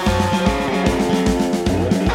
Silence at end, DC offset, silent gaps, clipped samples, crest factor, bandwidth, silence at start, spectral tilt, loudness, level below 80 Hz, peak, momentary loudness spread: 0 s; under 0.1%; none; under 0.1%; 14 dB; 16.5 kHz; 0 s; -6 dB/octave; -18 LUFS; -28 dBFS; -4 dBFS; 1 LU